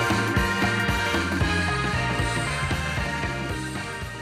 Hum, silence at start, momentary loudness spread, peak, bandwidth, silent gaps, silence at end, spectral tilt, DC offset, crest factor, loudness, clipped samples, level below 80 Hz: none; 0 s; 7 LU; -10 dBFS; 16 kHz; none; 0 s; -4.5 dB/octave; under 0.1%; 14 dB; -25 LUFS; under 0.1%; -36 dBFS